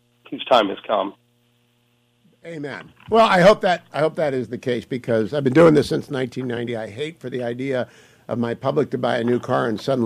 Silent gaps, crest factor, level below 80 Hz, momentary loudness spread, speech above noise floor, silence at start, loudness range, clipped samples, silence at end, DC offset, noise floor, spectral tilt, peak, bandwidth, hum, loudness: none; 16 dB; -54 dBFS; 17 LU; 43 dB; 0.3 s; 7 LU; under 0.1%; 0 s; under 0.1%; -63 dBFS; -6.5 dB/octave; -4 dBFS; 14 kHz; none; -20 LUFS